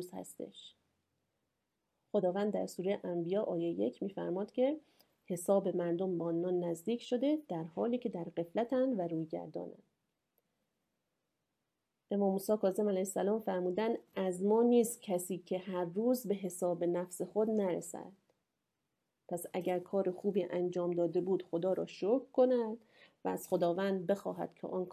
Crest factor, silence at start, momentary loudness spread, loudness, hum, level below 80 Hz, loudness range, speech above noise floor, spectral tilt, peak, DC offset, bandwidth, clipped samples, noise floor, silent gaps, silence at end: 18 dB; 0 s; 10 LU; -35 LUFS; none; -84 dBFS; 6 LU; 52 dB; -6.5 dB/octave; -18 dBFS; under 0.1%; 16 kHz; under 0.1%; -87 dBFS; none; 0 s